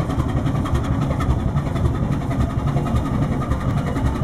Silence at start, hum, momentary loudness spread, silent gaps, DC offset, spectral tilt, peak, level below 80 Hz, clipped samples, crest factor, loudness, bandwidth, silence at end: 0 s; none; 1 LU; none; under 0.1%; -8 dB/octave; -6 dBFS; -26 dBFS; under 0.1%; 14 dB; -22 LUFS; 13.5 kHz; 0 s